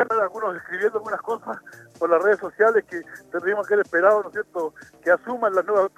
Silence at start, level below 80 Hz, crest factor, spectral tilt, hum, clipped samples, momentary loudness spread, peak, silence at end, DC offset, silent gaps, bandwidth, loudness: 0 s; -72 dBFS; 18 dB; -5.5 dB/octave; none; under 0.1%; 12 LU; -4 dBFS; 0.1 s; under 0.1%; none; 13.5 kHz; -22 LUFS